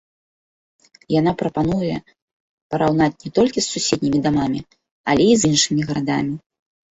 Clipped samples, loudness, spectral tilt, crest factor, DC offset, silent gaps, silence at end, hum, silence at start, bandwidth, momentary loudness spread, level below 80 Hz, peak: under 0.1%; -19 LUFS; -4.5 dB/octave; 18 dB; under 0.1%; 2.22-2.70 s, 4.91-5.04 s; 0.55 s; none; 1.1 s; 8.4 kHz; 12 LU; -48 dBFS; -2 dBFS